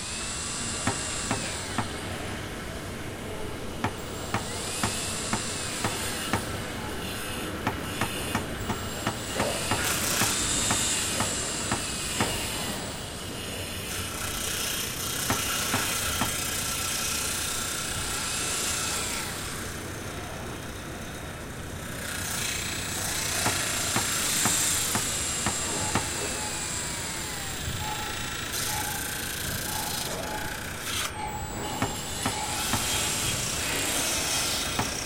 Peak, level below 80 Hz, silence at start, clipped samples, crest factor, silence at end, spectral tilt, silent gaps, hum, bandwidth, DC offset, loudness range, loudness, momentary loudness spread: -8 dBFS; -46 dBFS; 0 s; under 0.1%; 22 dB; 0 s; -2 dB/octave; none; none; 16.5 kHz; under 0.1%; 6 LU; -28 LUFS; 10 LU